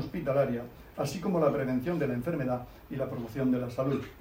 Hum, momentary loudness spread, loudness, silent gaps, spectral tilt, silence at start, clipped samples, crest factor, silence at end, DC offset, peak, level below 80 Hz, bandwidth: none; 9 LU; -31 LUFS; none; -7.5 dB/octave; 0 s; under 0.1%; 16 dB; 0 s; under 0.1%; -14 dBFS; -54 dBFS; 16 kHz